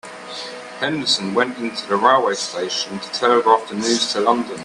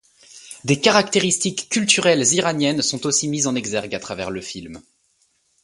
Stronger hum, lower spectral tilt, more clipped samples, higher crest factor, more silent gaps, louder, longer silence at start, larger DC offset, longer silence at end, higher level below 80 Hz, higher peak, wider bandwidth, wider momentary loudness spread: neither; about the same, -3 dB/octave vs -3 dB/octave; neither; about the same, 20 dB vs 22 dB; neither; about the same, -18 LUFS vs -19 LUFS; second, 0.05 s vs 0.35 s; neither; second, 0 s vs 0.85 s; second, -66 dBFS vs -58 dBFS; about the same, 0 dBFS vs 0 dBFS; about the same, 11.5 kHz vs 11.5 kHz; about the same, 14 LU vs 15 LU